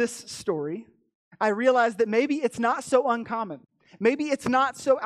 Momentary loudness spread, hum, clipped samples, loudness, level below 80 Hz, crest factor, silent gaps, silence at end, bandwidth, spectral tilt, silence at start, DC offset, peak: 11 LU; none; under 0.1%; -25 LUFS; -68 dBFS; 16 dB; 1.15-1.31 s; 0 s; 13.5 kHz; -4.5 dB/octave; 0 s; under 0.1%; -8 dBFS